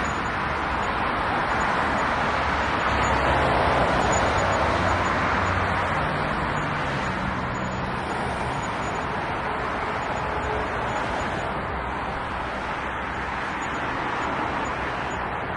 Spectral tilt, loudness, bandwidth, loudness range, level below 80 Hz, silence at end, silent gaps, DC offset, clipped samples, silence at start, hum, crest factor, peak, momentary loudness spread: -5 dB/octave; -25 LUFS; 11.5 kHz; 6 LU; -38 dBFS; 0 s; none; under 0.1%; under 0.1%; 0 s; none; 16 dB; -8 dBFS; 7 LU